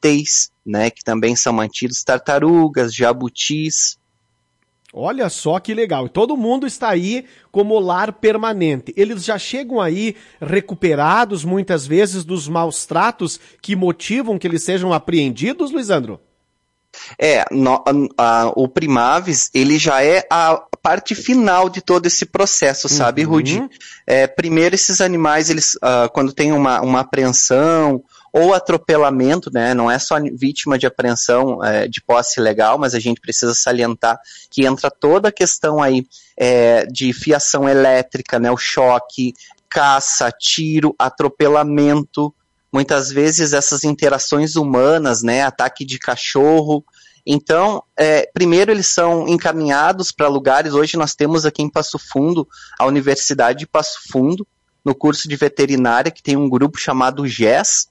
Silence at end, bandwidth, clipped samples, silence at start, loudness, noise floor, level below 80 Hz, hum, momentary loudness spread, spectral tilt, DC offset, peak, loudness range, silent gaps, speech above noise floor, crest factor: 0.05 s; 11.5 kHz; under 0.1%; 0.05 s; -15 LUFS; -68 dBFS; -56 dBFS; none; 7 LU; -3.5 dB/octave; under 0.1%; -2 dBFS; 4 LU; none; 53 dB; 14 dB